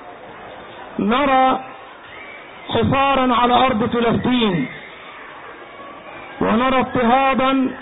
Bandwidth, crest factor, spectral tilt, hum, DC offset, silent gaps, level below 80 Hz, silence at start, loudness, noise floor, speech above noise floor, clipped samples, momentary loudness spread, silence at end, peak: 4 kHz; 16 dB; -11 dB/octave; none; under 0.1%; none; -44 dBFS; 0 s; -17 LUFS; -37 dBFS; 21 dB; under 0.1%; 21 LU; 0 s; -2 dBFS